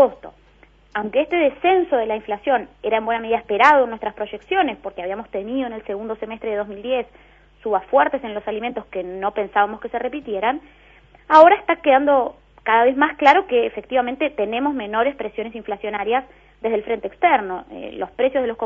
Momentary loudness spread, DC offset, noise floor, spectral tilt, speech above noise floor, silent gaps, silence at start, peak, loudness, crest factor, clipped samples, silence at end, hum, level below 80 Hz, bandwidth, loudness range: 14 LU; under 0.1%; -52 dBFS; -5.5 dB/octave; 32 dB; none; 0 s; 0 dBFS; -20 LUFS; 20 dB; under 0.1%; 0 s; none; -54 dBFS; 7.6 kHz; 8 LU